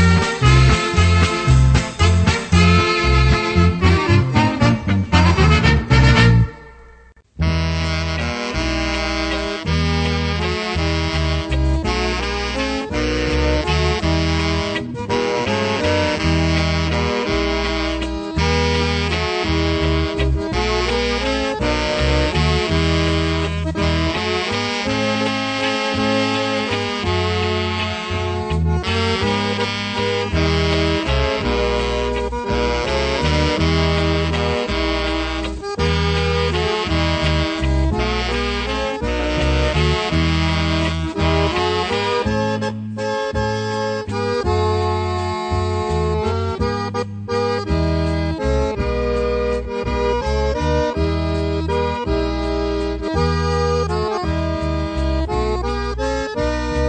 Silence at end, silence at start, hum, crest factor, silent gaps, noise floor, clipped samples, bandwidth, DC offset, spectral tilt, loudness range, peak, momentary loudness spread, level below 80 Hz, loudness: 0 s; 0 s; none; 16 dB; none; -46 dBFS; under 0.1%; 9 kHz; under 0.1%; -5.5 dB/octave; 5 LU; -2 dBFS; 7 LU; -26 dBFS; -19 LUFS